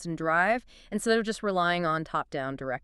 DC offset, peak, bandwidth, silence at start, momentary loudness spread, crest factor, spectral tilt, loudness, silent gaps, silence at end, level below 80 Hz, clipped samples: under 0.1%; -10 dBFS; 13 kHz; 0 s; 8 LU; 18 dB; -4.5 dB/octave; -28 LUFS; none; 0.05 s; -56 dBFS; under 0.1%